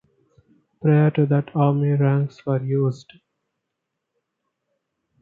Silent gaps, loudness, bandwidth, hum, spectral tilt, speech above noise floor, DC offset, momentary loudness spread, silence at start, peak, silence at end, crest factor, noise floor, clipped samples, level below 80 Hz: none; -20 LUFS; 4.8 kHz; none; -10 dB/octave; 61 dB; under 0.1%; 8 LU; 0.85 s; -4 dBFS; 2.25 s; 18 dB; -80 dBFS; under 0.1%; -66 dBFS